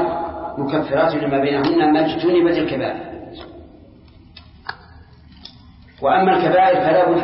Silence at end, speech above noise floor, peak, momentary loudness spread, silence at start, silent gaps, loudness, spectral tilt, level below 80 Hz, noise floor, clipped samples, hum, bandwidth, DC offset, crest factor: 0 s; 29 dB; -4 dBFS; 20 LU; 0 s; none; -17 LUFS; -10.5 dB/octave; -48 dBFS; -45 dBFS; under 0.1%; none; 5.8 kHz; under 0.1%; 14 dB